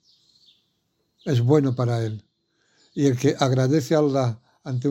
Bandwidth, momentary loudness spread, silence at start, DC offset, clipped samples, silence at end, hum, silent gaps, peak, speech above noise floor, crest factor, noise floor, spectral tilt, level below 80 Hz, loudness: 15 kHz; 15 LU; 1.25 s; under 0.1%; under 0.1%; 0 s; none; none; -4 dBFS; 51 dB; 18 dB; -72 dBFS; -7 dB/octave; -66 dBFS; -22 LUFS